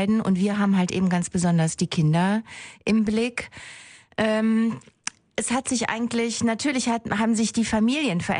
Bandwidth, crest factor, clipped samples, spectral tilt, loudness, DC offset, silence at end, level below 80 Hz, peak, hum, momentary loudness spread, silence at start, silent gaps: 10.5 kHz; 16 dB; under 0.1%; -5 dB/octave; -23 LUFS; under 0.1%; 0 s; -54 dBFS; -6 dBFS; none; 12 LU; 0 s; none